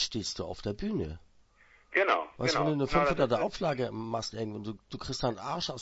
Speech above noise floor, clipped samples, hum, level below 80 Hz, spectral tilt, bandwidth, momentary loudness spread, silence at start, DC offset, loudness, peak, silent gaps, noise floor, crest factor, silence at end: 31 dB; under 0.1%; none; -50 dBFS; -4.5 dB/octave; 8 kHz; 11 LU; 0 s; under 0.1%; -31 LUFS; -12 dBFS; none; -62 dBFS; 20 dB; 0 s